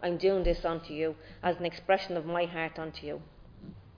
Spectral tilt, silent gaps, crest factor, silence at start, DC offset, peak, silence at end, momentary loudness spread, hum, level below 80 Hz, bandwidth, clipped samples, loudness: -7 dB/octave; none; 18 dB; 0 s; under 0.1%; -14 dBFS; 0 s; 15 LU; none; -44 dBFS; 5.2 kHz; under 0.1%; -32 LUFS